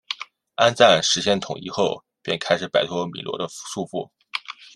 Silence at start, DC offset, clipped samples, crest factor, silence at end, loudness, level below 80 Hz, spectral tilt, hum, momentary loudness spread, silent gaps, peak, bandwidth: 0.1 s; under 0.1%; under 0.1%; 22 dB; 0.1 s; -22 LUFS; -64 dBFS; -3 dB/octave; none; 16 LU; none; -2 dBFS; 12 kHz